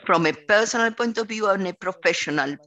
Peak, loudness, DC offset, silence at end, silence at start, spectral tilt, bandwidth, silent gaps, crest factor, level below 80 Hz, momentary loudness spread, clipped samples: -4 dBFS; -22 LUFS; under 0.1%; 0.1 s; 0.05 s; -3.5 dB/octave; 9 kHz; none; 18 dB; -66 dBFS; 5 LU; under 0.1%